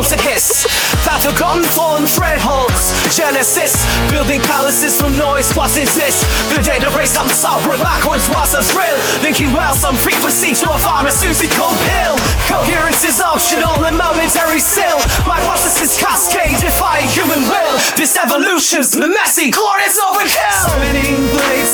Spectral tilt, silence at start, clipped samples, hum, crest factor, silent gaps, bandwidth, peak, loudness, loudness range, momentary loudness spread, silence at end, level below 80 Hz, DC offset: -2.5 dB/octave; 0 s; under 0.1%; none; 12 dB; none; over 20 kHz; 0 dBFS; -12 LUFS; 1 LU; 2 LU; 0 s; -24 dBFS; under 0.1%